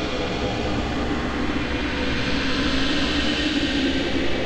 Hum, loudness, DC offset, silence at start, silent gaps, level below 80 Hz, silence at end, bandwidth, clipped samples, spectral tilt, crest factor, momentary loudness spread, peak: none; -23 LUFS; under 0.1%; 0 s; none; -32 dBFS; 0 s; 9.6 kHz; under 0.1%; -5 dB/octave; 12 dB; 4 LU; -10 dBFS